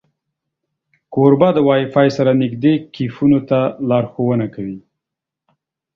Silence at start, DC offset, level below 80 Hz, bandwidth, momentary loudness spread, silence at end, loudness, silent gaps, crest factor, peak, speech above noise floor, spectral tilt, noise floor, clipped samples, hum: 1.1 s; under 0.1%; -56 dBFS; 6.8 kHz; 12 LU; 1.15 s; -15 LUFS; none; 16 dB; 0 dBFS; 69 dB; -8.5 dB/octave; -83 dBFS; under 0.1%; none